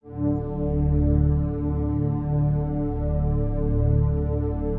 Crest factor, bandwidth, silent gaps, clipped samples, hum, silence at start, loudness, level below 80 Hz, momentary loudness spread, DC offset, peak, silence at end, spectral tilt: 12 dB; 2.5 kHz; none; under 0.1%; none; 0.05 s; -24 LUFS; -28 dBFS; 5 LU; under 0.1%; -10 dBFS; 0 s; -14 dB/octave